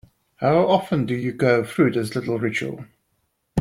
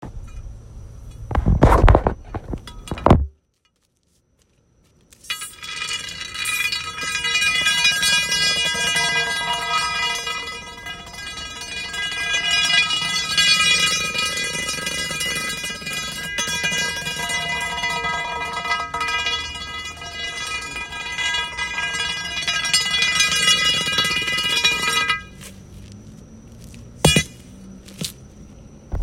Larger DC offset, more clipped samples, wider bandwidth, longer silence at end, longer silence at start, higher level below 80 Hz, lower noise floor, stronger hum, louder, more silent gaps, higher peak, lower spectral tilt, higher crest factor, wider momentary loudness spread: neither; neither; about the same, 16 kHz vs 16.5 kHz; about the same, 0 s vs 0 s; first, 0.4 s vs 0 s; second, -58 dBFS vs -32 dBFS; first, -71 dBFS vs -66 dBFS; neither; about the same, -21 LUFS vs -19 LUFS; neither; second, -4 dBFS vs 0 dBFS; first, -7 dB/octave vs -2.5 dB/octave; about the same, 18 dB vs 22 dB; second, 9 LU vs 16 LU